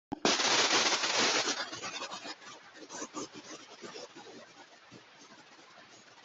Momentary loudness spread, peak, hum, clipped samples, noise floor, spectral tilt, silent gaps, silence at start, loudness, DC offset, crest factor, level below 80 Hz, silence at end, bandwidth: 23 LU; -12 dBFS; none; under 0.1%; -56 dBFS; -0.5 dB/octave; none; 0.1 s; -29 LUFS; under 0.1%; 22 dB; -76 dBFS; 0.05 s; 8.2 kHz